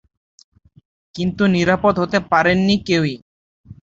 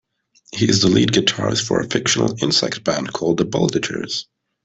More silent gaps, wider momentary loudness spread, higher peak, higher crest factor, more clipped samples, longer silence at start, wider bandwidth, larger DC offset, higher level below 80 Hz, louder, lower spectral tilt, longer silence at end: first, 3.22-3.64 s vs none; about the same, 9 LU vs 9 LU; about the same, 0 dBFS vs -2 dBFS; about the same, 18 dB vs 16 dB; neither; first, 1.15 s vs 0.5 s; second, 7.6 kHz vs 8.4 kHz; neither; about the same, -48 dBFS vs -52 dBFS; about the same, -17 LUFS vs -18 LUFS; first, -6 dB/octave vs -4 dB/octave; second, 0.25 s vs 0.4 s